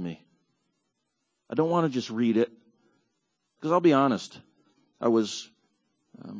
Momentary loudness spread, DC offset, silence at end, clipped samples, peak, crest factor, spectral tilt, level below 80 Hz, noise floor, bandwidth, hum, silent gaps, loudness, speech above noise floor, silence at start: 17 LU; under 0.1%; 0 s; under 0.1%; -10 dBFS; 20 dB; -6 dB/octave; -74 dBFS; -79 dBFS; 8 kHz; none; none; -26 LUFS; 54 dB; 0 s